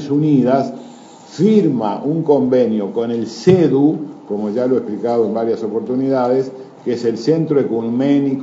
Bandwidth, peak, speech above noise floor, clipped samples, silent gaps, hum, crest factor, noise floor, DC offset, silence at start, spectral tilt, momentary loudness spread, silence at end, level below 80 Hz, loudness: 7.8 kHz; 0 dBFS; 23 dB; under 0.1%; none; none; 16 dB; -38 dBFS; under 0.1%; 0 s; -8 dB/octave; 10 LU; 0 s; -62 dBFS; -16 LUFS